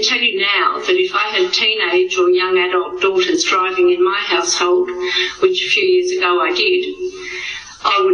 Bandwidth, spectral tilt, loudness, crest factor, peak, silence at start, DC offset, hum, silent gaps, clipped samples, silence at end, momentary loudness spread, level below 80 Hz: 10 kHz; -1.5 dB/octave; -15 LUFS; 14 dB; 0 dBFS; 0 s; under 0.1%; none; none; under 0.1%; 0 s; 6 LU; -56 dBFS